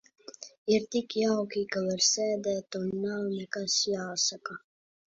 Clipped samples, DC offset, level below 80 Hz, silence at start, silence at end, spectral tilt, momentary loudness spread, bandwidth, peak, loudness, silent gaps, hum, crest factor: under 0.1%; under 0.1%; -72 dBFS; 0.3 s; 0.5 s; -3 dB/octave; 15 LU; 7.8 kHz; -12 dBFS; -29 LUFS; 0.58-0.66 s; none; 18 dB